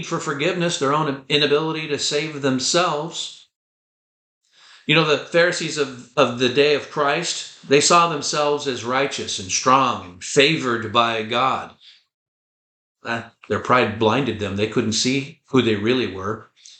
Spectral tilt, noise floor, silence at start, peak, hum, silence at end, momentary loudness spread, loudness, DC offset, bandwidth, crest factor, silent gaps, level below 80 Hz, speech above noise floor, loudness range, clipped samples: -3.5 dB/octave; under -90 dBFS; 0 s; -2 dBFS; none; 0.35 s; 11 LU; -20 LUFS; under 0.1%; 9.4 kHz; 18 dB; 3.56-4.41 s, 12.14-12.95 s; -64 dBFS; over 70 dB; 5 LU; under 0.1%